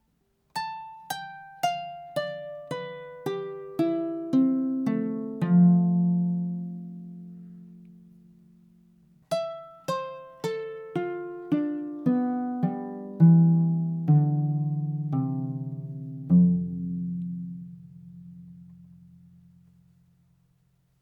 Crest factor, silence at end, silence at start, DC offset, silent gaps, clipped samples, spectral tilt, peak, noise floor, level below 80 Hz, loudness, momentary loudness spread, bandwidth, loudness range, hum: 18 dB; 2.25 s; 0.55 s; under 0.1%; none; under 0.1%; -8.5 dB/octave; -8 dBFS; -70 dBFS; -68 dBFS; -27 LUFS; 21 LU; 12 kHz; 13 LU; none